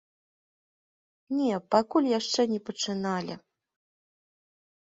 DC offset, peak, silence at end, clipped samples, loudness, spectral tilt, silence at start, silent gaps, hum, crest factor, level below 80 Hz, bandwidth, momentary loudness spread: under 0.1%; -8 dBFS; 1.45 s; under 0.1%; -28 LUFS; -4.5 dB/octave; 1.3 s; none; none; 22 dB; -74 dBFS; 7.8 kHz; 9 LU